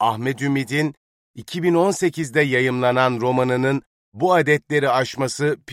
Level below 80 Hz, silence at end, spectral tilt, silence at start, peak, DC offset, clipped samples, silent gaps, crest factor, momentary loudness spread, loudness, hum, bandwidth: -62 dBFS; 0 s; -5.5 dB/octave; 0 s; -4 dBFS; under 0.1%; under 0.1%; 0.97-1.34 s, 3.86-4.12 s; 16 dB; 6 LU; -20 LUFS; none; 15.5 kHz